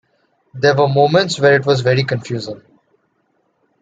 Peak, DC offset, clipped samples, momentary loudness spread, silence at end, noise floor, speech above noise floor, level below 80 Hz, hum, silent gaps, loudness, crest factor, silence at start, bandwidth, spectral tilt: 0 dBFS; under 0.1%; under 0.1%; 13 LU; 1.25 s; -64 dBFS; 50 dB; -56 dBFS; none; none; -15 LUFS; 16 dB; 0.55 s; 9.2 kHz; -5.5 dB/octave